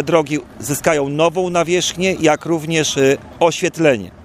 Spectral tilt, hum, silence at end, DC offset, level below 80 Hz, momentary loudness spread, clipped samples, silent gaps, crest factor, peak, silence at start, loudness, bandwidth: -4 dB/octave; none; 0 s; under 0.1%; -50 dBFS; 4 LU; under 0.1%; none; 16 dB; 0 dBFS; 0 s; -16 LUFS; 15.5 kHz